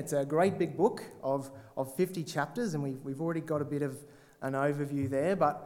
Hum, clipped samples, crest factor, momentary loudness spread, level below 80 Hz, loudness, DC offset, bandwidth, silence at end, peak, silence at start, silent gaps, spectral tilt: none; under 0.1%; 18 dB; 9 LU; -70 dBFS; -33 LUFS; under 0.1%; 17.5 kHz; 0 s; -14 dBFS; 0 s; none; -6.5 dB/octave